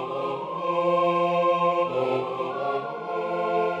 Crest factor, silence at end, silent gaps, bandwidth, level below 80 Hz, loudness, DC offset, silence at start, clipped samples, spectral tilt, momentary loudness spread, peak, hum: 14 dB; 0 s; none; 7.8 kHz; -70 dBFS; -25 LUFS; under 0.1%; 0 s; under 0.1%; -7 dB/octave; 8 LU; -12 dBFS; none